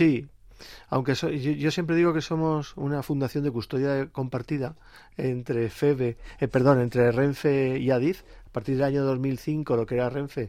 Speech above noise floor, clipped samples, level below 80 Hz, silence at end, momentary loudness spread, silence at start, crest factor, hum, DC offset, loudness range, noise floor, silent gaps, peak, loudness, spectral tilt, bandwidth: 22 dB; under 0.1%; -52 dBFS; 0 s; 9 LU; 0 s; 18 dB; none; under 0.1%; 4 LU; -47 dBFS; none; -8 dBFS; -26 LUFS; -7.5 dB/octave; 15.5 kHz